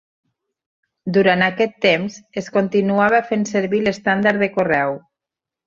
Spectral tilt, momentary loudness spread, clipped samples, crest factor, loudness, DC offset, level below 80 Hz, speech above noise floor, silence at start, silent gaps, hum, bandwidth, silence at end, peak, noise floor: -5.5 dB/octave; 8 LU; under 0.1%; 18 dB; -18 LUFS; under 0.1%; -58 dBFS; 69 dB; 1.05 s; none; none; 7.6 kHz; 0.7 s; -2 dBFS; -86 dBFS